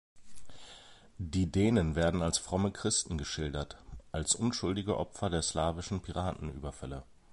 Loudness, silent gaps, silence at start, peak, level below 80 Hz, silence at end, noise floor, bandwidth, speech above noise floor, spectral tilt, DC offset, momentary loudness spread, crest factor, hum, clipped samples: -33 LUFS; none; 0.15 s; -14 dBFS; -46 dBFS; 0 s; -55 dBFS; 11.5 kHz; 22 dB; -4.5 dB/octave; under 0.1%; 17 LU; 18 dB; none; under 0.1%